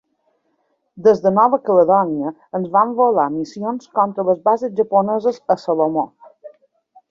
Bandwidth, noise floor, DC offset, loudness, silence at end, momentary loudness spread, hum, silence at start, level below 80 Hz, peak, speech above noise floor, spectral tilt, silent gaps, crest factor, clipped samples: 7.4 kHz; -67 dBFS; under 0.1%; -17 LUFS; 0.6 s; 10 LU; none; 0.95 s; -64 dBFS; -2 dBFS; 50 dB; -8 dB/octave; none; 16 dB; under 0.1%